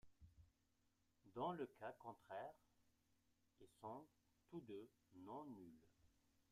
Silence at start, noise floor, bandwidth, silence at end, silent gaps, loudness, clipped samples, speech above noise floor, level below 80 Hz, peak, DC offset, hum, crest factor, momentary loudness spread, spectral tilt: 0.05 s; -84 dBFS; 15 kHz; 0.1 s; none; -56 LUFS; under 0.1%; 29 dB; -84 dBFS; -34 dBFS; under 0.1%; none; 22 dB; 12 LU; -7 dB/octave